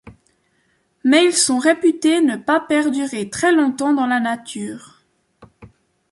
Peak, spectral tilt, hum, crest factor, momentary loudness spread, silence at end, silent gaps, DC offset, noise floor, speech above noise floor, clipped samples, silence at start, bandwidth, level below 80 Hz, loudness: -2 dBFS; -2.5 dB/octave; none; 16 dB; 12 LU; 0.45 s; none; under 0.1%; -64 dBFS; 47 dB; under 0.1%; 0.05 s; 11.5 kHz; -60 dBFS; -17 LUFS